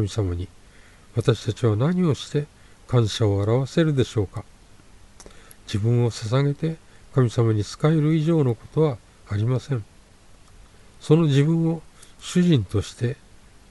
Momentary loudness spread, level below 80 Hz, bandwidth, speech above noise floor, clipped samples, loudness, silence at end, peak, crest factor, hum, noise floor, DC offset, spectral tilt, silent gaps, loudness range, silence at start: 12 LU; -50 dBFS; 11.5 kHz; 29 dB; under 0.1%; -23 LUFS; 0.55 s; -4 dBFS; 18 dB; none; -50 dBFS; under 0.1%; -7 dB/octave; none; 3 LU; 0 s